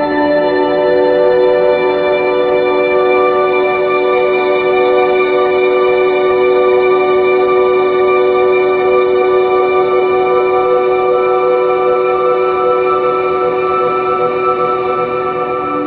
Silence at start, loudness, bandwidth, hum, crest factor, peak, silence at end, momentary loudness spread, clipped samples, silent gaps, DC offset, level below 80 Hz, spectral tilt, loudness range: 0 s; -12 LUFS; 4.7 kHz; none; 10 dB; 0 dBFS; 0 s; 3 LU; under 0.1%; none; under 0.1%; -48 dBFS; -8.5 dB/octave; 2 LU